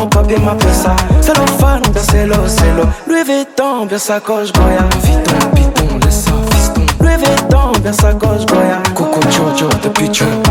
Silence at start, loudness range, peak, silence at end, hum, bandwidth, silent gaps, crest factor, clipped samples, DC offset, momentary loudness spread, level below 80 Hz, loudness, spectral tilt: 0 s; 1 LU; 0 dBFS; 0 s; none; 18 kHz; none; 10 dB; under 0.1%; under 0.1%; 4 LU; -16 dBFS; -11 LUFS; -5 dB/octave